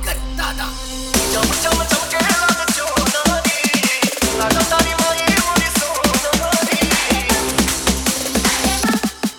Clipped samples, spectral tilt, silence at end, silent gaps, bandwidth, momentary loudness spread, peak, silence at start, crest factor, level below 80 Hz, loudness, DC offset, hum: under 0.1%; -2.5 dB/octave; 0 s; none; 19.5 kHz; 5 LU; 0 dBFS; 0 s; 18 dB; -30 dBFS; -16 LUFS; under 0.1%; none